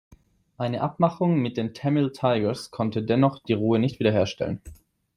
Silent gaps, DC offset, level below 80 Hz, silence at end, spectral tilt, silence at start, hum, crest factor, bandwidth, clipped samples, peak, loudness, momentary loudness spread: none; under 0.1%; -56 dBFS; 0.45 s; -7.5 dB/octave; 0.6 s; none; 18 dB; 12.5 kHz; under 0.1%; -6 dBFS; -25 LUFS; 8 LU